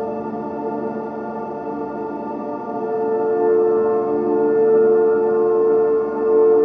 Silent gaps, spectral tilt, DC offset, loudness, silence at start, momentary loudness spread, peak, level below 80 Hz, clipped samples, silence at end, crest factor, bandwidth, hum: none; -10 dB/octave; under 0.1%; -19 LUFS; 0 s; 12 LU; -6 dBFS; -62 dBFS; under 0.1%; 0 s; 12 dB; 2.8 kHz; none